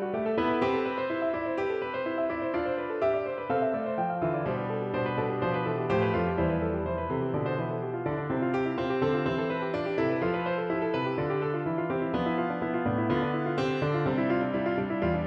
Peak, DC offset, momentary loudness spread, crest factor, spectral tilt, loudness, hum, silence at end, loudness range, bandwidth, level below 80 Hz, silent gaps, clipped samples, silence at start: -14 dBFS; under 0.1%; 3 LU; 16 dB; -8.5 dB/octave; -29 LUFS; none; 0 s; 1 LU; 7.4 kHz; -52 dBFS; none; under 0.1%; 0 s